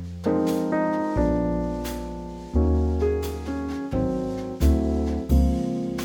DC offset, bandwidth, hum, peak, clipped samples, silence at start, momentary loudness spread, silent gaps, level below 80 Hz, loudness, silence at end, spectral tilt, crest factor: under 0.1%; 19 kHz; none; -8 dBFS; under 0.1%; 0 s; 8 LU; none; -28 dBFS; -25 LUFS; 0 s; -8 dB/octave; 16 dB